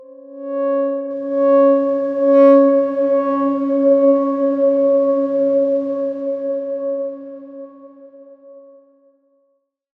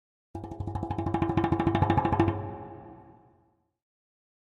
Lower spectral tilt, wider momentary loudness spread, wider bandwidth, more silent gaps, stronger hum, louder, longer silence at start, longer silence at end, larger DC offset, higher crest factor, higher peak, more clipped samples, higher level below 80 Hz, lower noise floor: about the same, -8.5 dB/octave vs -9 dB/octave; second, 14 LU vs 20 LU; second, 3.8 kHz vs 7 kHz; neither; neither; first, -16 LUFS vs -28 LUFS; second, 0 s vs 0.35 s; about the same, 1.4 s vs 1.45 s; neither; about the same, 16 dB vs 20 dB; first, -2 dBFS vs -10 dBFS; neither; second, -72 dBFS vs -46 dBFS; about the same, -66 dBFS vs -68 dBFS